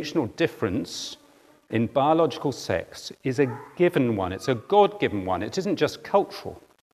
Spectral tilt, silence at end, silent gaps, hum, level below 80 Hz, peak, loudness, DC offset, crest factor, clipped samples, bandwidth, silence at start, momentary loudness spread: -6 dB/octave; 0.35 s; none; none; -64 dBFS; -6 dBFS; -25 LUFS; under 0.1%; 20 dB; under 0.1%; 14 kHz; 0 s; 12 LU